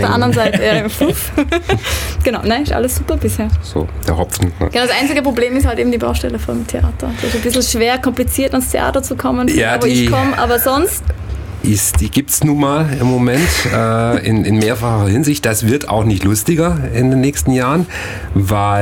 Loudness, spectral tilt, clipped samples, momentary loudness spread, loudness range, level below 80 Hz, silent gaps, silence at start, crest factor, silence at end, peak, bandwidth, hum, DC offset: -15 LUFS; -5 dB/octave; under 0.1%; 6 LU; 2 LU; -26 dBFS; none; 0 s; 12 dB; 0 s; -2 dBFS; 18 kHz; none; under 0.1%